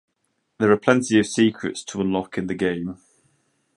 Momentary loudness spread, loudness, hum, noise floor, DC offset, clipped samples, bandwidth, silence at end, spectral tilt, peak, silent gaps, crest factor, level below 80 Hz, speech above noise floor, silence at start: 11 LU; -22 LUFS; none; -73 dBFS; under 0.1%; under 0.1%; 11.5 kHz; 0.85 s; -5 dB/octave; -2 dBFS; none; 22 dB; -56 dBFS; 52 dB; 0.6 s